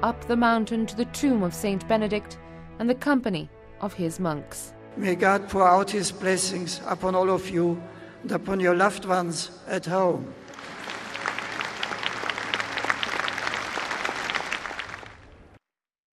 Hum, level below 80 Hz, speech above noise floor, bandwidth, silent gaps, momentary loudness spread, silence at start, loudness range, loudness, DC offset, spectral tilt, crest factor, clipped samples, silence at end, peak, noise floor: none; -54 dBFS; 38 dB; 14 kHz; none; 15 LU; 0 s; 5 LU; -26 LUFS; under 0.1%; -4.5 dB/octave; 22 dB; under 0.1%; 0.7 s; -4 dBFS; -63 dBFS